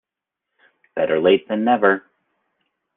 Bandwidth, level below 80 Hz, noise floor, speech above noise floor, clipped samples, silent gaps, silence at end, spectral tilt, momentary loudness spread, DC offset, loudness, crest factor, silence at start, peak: 3.9 kHz; -64 dBFS; -84 dBFS; 67 dB; under 0.1%; none; 1 s; -9 dB/octave; 8 LU; under 0.1%; -18 LUFS; 18 dB; 0.95 s; -2 dBFS